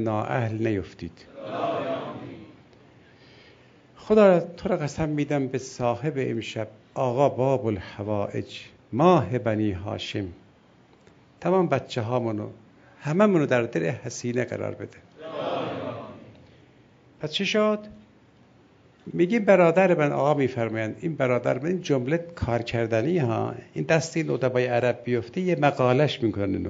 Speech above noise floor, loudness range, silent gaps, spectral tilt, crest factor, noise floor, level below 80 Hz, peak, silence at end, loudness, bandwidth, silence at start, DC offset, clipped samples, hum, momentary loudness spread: 32 dB; 8 LU; none; -6.5 dB/octave; 20 dB; -56 dBFS; -56 dBFS; -4 dBFS; 0 s; -25 LUFS; 7.8 kHz; 0 s; under 0.1%; under 0.1%; none; 16 LU